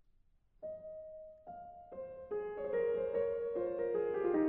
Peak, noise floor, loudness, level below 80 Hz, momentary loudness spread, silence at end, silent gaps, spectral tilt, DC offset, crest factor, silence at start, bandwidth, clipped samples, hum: -22 dBFS; -69 dBFS; -38 LUFS; -68 dBFS; 17 LU; 0 s; none; -7 dB/octave; under 0.1%; 16 dB; 0.6 s; 3.6 kHz; under 0.1%; none